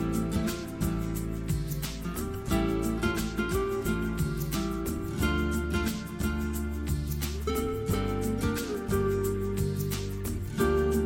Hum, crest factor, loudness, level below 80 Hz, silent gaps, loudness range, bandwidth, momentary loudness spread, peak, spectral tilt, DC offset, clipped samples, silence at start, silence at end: none; 16 dB; -31 LUFS; -38 dBFS; none; 1 LU; 17 kHz; 5 LU; -14 dBFS; -6 dB/octave; under 0.1%; under 0.1%; 0 s; 0 s